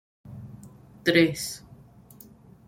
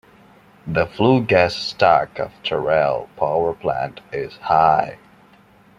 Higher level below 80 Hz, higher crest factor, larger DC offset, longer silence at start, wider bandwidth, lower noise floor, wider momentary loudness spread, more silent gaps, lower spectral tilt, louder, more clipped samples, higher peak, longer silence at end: second, -60 dBFS vs -52 dBFS; first, 24 dB vs 18 dB; neither; second, 0.25 s vs 0.65 s; first, 16.5 kHz vs 10.5 kHz; about the same, -51 dBFS vs -51 dBFS; first, 25 LU vs 12 LU; neither; second, -4.5 dB/octave vs -6.5 dB/octave; second, -24 LUFS vs -19 LUFS; neither; second, -6 dBFS vs -2 dBFS; first, 1.1 s vs 0.85 s